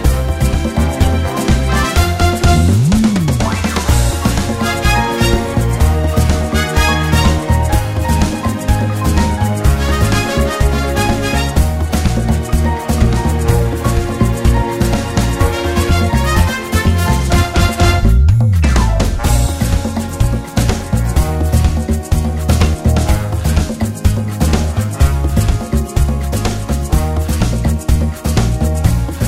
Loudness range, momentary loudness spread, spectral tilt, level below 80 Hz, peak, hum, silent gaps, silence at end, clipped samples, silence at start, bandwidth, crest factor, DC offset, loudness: 3 LU; 4 LU; -5.5 dB/octave; -16 dBFS; 0 dBFS; none; none; 0 s; under 0.1%; 0 s; 16 kHz; 12 dB; 0.2%; -14 LUFS